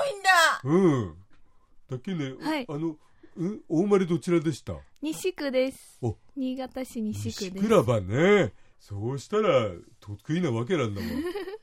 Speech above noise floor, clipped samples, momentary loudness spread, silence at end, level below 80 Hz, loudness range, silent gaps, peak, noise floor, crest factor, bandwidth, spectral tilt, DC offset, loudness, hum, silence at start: 26 dB; under 0.1%; 14 LU; 0.05 s; -58 dBFS; 5 LU; none; -6 dBFS; -53 dBFS; 20 dB; 16 kHz; -5.5 dB/octave; under 0.1%; -27 LUFS; none; 0 s